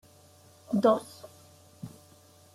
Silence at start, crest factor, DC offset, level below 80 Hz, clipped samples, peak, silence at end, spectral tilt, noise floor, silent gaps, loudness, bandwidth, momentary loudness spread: 0.7 s; 22 dB; under 0.1%; -74 dBFS; under 0.1%; -10 dBFS; 0.65 s; -6.5 dB/octave; -57 dBFS; none; -27 LUFS; 15.5 kHz; 24 LU